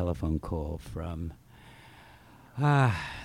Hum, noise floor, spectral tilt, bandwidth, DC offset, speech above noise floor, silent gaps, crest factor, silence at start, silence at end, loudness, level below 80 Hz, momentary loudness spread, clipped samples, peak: none; -54 dBFS; -7.5 dB/octave; 12.5 kHz; under 0.1%; 25 dB; none; 18 dB; 0 s; 0 s; -30 LUFS; -44 dBFS; 17 LU; under 0.1%; -12 dBFS